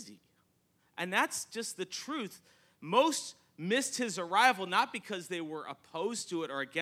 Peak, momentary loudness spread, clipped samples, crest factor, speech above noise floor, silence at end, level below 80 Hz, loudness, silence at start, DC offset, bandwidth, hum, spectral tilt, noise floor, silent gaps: -10 dBFS; 16 LU; under 0.1%; 24 dB; 40 dB; 0 s; -88 dBFS; -33 LUFS; 0 s; under 0.1%; 16.5 kHz; none; -2.5 dB/octave; -73 dBFS; none